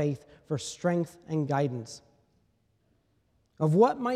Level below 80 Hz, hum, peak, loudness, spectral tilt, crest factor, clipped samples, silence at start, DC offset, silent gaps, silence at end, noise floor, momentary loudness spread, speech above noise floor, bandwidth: -70 dBFS; none; -10 dBFS; -29 LUFS; -7 dB/octave; 20 dB; under 0.1%; 0 s; under 0.1%; none; 0 s; -70 dBFS; 17 LU; 43 dB; 12.5 kHz